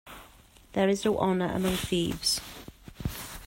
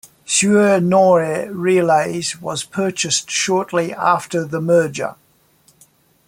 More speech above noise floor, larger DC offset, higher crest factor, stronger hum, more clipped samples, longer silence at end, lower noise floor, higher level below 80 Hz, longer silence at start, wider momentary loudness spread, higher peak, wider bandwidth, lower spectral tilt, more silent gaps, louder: second, 28 dB vs 39 dB; neither; about the same, 18 dB vs 16 dB; neither; neither; second, 0 s vs 1.15 s; about the same, -55 dBFS vs -55 dBFS; first, -48 dBFS vs -60 dBFS; second, 0.05 s vs 0.3 s; first, 20 LU vs 10 LU; second, -12 dBFS vs -2 dBFS; about the same, 16.5 kHz vs 16.5 kHz; about the same, -4.5 dB/octave vs -4 dB/octave; neither; second, -28 LUFS vs -17 LUFS